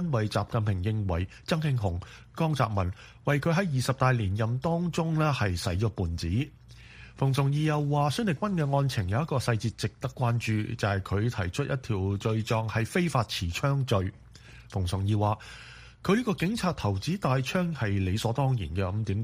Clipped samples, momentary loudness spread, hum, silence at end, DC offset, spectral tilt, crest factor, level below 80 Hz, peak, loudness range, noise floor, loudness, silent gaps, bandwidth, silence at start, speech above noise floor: under 0.1%; 6 LU; none; 0 s; under 0.1%; -6.5 dB/octave; 18 dB; -48 dBFS; -10 dBFS; 2 LU; -50 dBFS; -29 LUFS; none; 15.5 kHz; 0 s; 22 dB